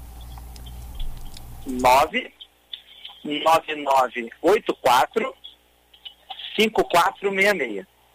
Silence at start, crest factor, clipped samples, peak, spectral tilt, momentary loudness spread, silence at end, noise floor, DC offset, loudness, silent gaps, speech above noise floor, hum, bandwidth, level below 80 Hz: 0 s; 16 dB; under 0.1%; -6 dBFS; -3.5 dB/octave; 22 LU; 0.3 s; -56 dBFS; under 0.1%; -21 LUFS; none; 36 dB; 60 Hz at -60 dBFS; 16 kHz; -40 dBFS